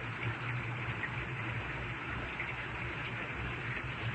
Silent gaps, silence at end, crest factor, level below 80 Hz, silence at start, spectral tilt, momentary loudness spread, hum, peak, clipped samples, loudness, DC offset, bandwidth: none; 0 s; 14 dB; -52 dBFS; 0 s; -6.5 dB/octave; 1 LU; none; -26 dBFS; under 0.1%; -38 LUFS; under 0.1%; 8.4 kHz